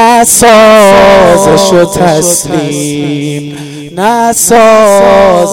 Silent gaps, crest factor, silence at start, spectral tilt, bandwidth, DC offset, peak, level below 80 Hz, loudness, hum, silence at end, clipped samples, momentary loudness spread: none; 4 dB; 0 s; -3.5 dB/octave; 18 kHz; under 0.1%; 0 dBFS; -34 dBFS; -4 LUFS; none; 0 s; 7%; 12 LU